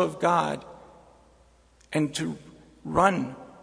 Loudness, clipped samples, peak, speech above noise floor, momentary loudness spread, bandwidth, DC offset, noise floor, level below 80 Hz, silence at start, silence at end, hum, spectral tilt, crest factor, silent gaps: -27 LUFS; under 0.1%; -6 dBFS; 33 dB; 19 LU; 11 kHz; under 0.1%; -59 dBFS; -56 dBFS; 0 s; 0.1 s; none; -5.5 dB/octave; 22 dB; none